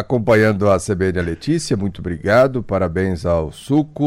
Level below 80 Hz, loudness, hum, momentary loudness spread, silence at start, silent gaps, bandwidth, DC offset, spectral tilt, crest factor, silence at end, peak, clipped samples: -38 dBFS; -18 LUFS; none; 7 LU; 0 s; none; 16 kHz; under 0.1%; -6.5 dB/octave; 12 dB; 0 s; -4 dBFS; under 0.1%